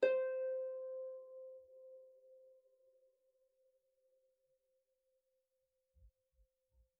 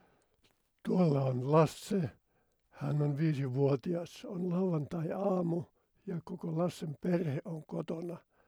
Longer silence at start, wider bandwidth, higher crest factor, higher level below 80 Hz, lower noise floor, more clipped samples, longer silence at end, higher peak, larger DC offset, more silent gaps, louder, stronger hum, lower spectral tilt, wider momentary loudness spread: second, 0 s vs 0.85 s; second, 3.7 kHz vs 14.5 kHz; first, 26 dB vs 20 dB; second, -82 dBFS vs -72 dBFS; first, -87 dBFS vs -75 dBFS; neither; first, 0.9 s vs 0.3 s; second, -20 dBFS vs -14 dBFS; neither; neither; second, -42 LUFS vs -34 LUFS; neither; second, 1.5 dB/octave vs -8 dB/octave; first, 23 LU vs 13 LU